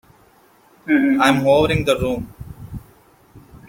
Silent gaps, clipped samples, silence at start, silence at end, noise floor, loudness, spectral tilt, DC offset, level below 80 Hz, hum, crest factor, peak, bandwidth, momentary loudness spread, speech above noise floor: none; under 0.1%; 0.85 s; 0.15 s; -53 dBFS; -17 LUFS; -6 dB/octave; under 0.1%; -42 dBFS; none; 18 dB; -2 dBFS; 16.5 kHz; 22 LU; 37 dB